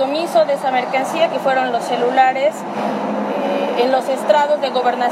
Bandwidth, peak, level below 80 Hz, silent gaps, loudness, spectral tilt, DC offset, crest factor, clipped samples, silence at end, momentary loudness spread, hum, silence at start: 15 kHz; -2 dBFS; -82 dBFS; none; -17 LUFS; -4.5 dB/octave; under 0.1%; 16 dB; under 0.1%; 0 s; 6 LU; none; 0 s